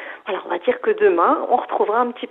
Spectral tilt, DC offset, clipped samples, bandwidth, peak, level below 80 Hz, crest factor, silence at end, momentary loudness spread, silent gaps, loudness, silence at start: -7 dB/octave; under 0.1%; under 0.1%; 4.1 kHz; -4 dBFS; -68 dBFS; 16 dB; 0.05 s; 10 LU; none; -19 LUFS; 0 s